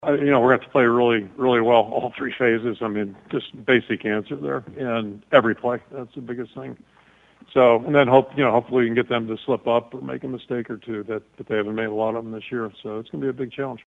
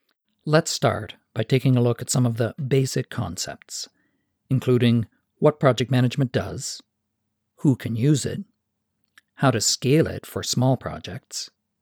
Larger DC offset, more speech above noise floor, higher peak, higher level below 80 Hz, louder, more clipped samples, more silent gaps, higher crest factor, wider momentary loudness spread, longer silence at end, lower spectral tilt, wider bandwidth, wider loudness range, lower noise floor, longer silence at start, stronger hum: neither; second, 31 dB vs 55 dB; first, 0 dBFS vs -4 dBFS; about the same, -62 dBFS vs -58 dBFS; about the same, -22 LUFS vs -23 LUFS; neither; neither; about the same, 22 dB vs 20 dB; about the same, 15 LU vs 14 LU; second, 0.1 s vs 0.35 s; first, -8 dB/octave vs -5.5 dB/octave; second, 7.4 kHz vs 17 kHz; first, 7 LU vs 2 LU; second, -53 dBFS vs -77 dBFS; second, 0 s vs 0.45 s; neither